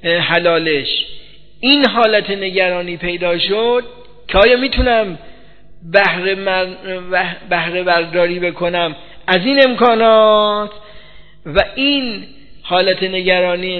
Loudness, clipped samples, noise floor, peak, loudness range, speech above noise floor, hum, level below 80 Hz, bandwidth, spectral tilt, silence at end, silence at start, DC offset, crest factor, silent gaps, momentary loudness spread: -14 LUFS; under 0.1%; -43 dBFS; 0 dBFS; 3 LU; 29 dB; none; -36 dBFS; 6 kHz; -7 dB/octave; 0 s; 0.05 s; 1%; 16 dB; none; 11 LU